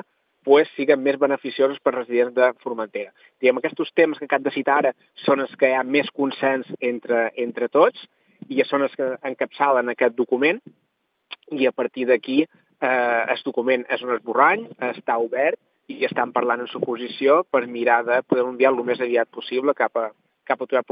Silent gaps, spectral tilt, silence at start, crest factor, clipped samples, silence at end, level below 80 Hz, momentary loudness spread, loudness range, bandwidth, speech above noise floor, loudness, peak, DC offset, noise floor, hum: none; -8 dB/octave; 0.45 s; 20 dB; under 0.1%; 0.1 s; -88 dBFS; 9 LU; 2 LU; 5.2 kHz; 23 dB; -21 LUFS; -2 dBFS; under 0.1%; -44 dBFS; none